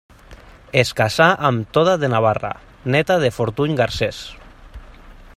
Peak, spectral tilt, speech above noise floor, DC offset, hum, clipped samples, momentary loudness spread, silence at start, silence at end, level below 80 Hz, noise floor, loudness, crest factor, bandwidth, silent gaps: 0 dBFS; -5.5 dB/octave; 25 dB; under 0.1%; none; under 0.1%; 11 LU; 0.3 s; 0.1 s; -44 dBFS; -43 dBFS; -18 LUFS; 20 dB; 15 kHz; none